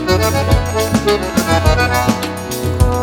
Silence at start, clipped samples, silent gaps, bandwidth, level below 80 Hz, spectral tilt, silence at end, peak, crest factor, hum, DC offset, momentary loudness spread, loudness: 0 s; under 0.1%; none; 20 kHz; -22 dBFS; -5 dB/octave; 0 s; 0 dBFS; 14 dB; none; under 0.1%; 7 LU; -15 LUFS